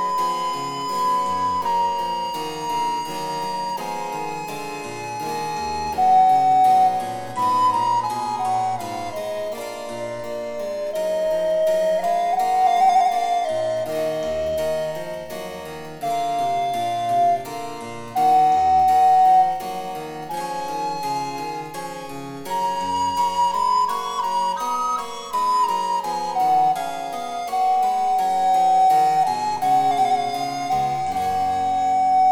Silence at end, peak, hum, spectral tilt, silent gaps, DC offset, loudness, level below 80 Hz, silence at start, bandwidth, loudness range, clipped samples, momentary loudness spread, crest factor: 0 s; -8 dBFS; none; -4 dB/octave; none; under 0.1%; -21 LUFS; -54 dBFS; 0 s; 17 kHz; 7 LU; under 0.1%; 14 LU; 14 dB